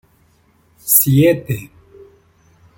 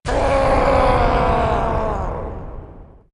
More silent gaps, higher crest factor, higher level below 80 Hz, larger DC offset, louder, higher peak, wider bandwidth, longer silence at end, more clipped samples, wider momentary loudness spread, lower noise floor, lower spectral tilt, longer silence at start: neither; about the same, 18 dB vs 16 dB; second, -52 dBFS vs -24 dBFS; neither; first, -13 LUFS vs -18 LUFS; about the same, 0 dBFS vs -2 dBFS; first, 17 kHz vs 11 kHz; first, 1.1 s vs 0.3 s; neither; about the same, 16 LU vs 17 LU; first, -55 dBFS vs -39 dBFS; second, -5 dB/octave vs -6.5 dB/octave; first, 0.85 s vs 0.05 s